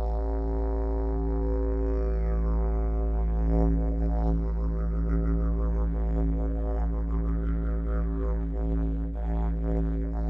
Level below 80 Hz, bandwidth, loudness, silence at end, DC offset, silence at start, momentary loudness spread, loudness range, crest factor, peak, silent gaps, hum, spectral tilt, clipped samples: -26 dBFS; 2.4 kHz; -29 LUFS; 0 s; under 0.1%; 0 s; 3 LU; 2 LU; 14 dB; -12 dBFS; none; none; -11.5 dB/octave; under 0.1%